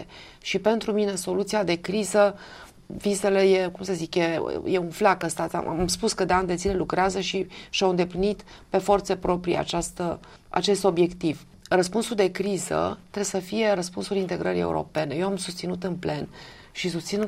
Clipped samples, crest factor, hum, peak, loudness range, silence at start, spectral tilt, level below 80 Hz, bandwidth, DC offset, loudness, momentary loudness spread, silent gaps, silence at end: under 0.1%; 18 dB; none; -8 dBFS; 3 LU; 0 s; -4.5 dB/octave; -48 dBFS; 15.5 kHz; under 0.1%; -25 LUFS; 9 LU; none; 0 s